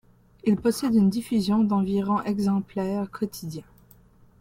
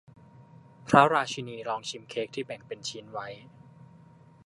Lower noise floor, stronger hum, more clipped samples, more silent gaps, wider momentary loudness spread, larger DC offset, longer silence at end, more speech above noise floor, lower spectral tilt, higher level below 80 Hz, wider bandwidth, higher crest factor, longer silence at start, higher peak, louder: about the same, -55 dBFS vs -55 dBFS; neither; neither; neither; second, 10 LU vs 19 LU; neither; second, 0.8 s vs 1 s; first, 31 dB vs 26 dB; first, -7 dB/octave vs -4.5 dB/octave; first, -56 dBFS vs -66 dBFS; first, 16 kHz vs 11.5 kHz; second, 14 dB vs 28 dB; about the same, 0.45 s vs 0.4 s; second, -10 dBFS vs -2 dBFS; first, -25 LUFS vs -28 LUFS